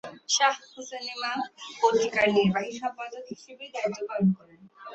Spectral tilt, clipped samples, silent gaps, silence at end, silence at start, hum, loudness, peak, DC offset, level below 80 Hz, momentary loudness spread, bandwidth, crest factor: -4 dB/octave; under 0.1%; none; 0 s; 0.05 s; none; -27 LUFS; -6 dBFS; under 0.1%; -68 dBFS; 16 LU; 8.2 kHz; 22 dB